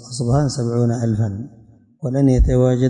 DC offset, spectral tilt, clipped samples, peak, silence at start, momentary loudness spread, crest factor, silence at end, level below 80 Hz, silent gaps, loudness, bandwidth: under 0.1%; -7.5 dB/octave; under 0.1%; -6 dBFS; 0 s; 13 LU; 12 dB; 0 s; -26 dBFS; none; -18 LUFS; 10.5 kHz